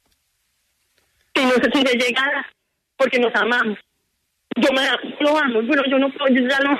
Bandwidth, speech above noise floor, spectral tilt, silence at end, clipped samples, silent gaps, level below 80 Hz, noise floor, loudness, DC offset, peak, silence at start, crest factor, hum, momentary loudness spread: 13.5 kHz; 53 dB; -3.5 dB/octave; 0 s; under 0.1%; none; -62 dBFS; -71 dBFS; -18 LUFS; under 0.1%; -4 dBFS; 1.35 s; 14 dB; none; 8 LU